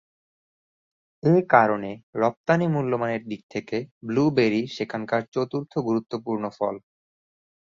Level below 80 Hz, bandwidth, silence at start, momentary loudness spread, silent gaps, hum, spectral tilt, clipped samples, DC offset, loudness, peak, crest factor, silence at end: -64 dBFS; 7.4 kHz; 1.25 s; 12 LU; 2.03-2.13 s, 2.37-2.44 s, 3.43-3.49 s, 3.91-4.01 s, 5.28-5.32 s; none; -7.5 dB/octave; under 0.1%; under 0.1%; -24 LUFS; -2 dBFS; 22 dB; 0.95 s